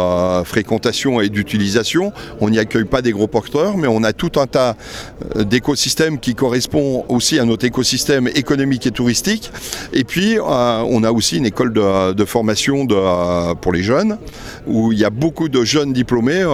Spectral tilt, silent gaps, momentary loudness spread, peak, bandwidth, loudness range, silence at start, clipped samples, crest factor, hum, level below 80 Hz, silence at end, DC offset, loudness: -4.5 dB/octave; none; 5 LU; 0 dBFS; 16 kHz; 1 LU; 0 s; under 0.1%; 16 dB; none; -40 dBFS; 0 s; under 0.1%; -16 LUFS